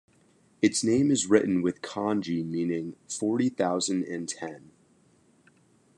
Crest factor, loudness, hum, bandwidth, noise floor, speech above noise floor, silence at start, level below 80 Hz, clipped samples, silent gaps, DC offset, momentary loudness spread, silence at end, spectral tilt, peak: 22 dB; -27 LUFS; none; 11.5 kHz; -63 dBFS; 36 dB; 0.6 s; -72 dBFS; under 0.1%; none; under 0.1%; 11 LU; 1.4 s; -4.5 dB/octave; -6 dBFS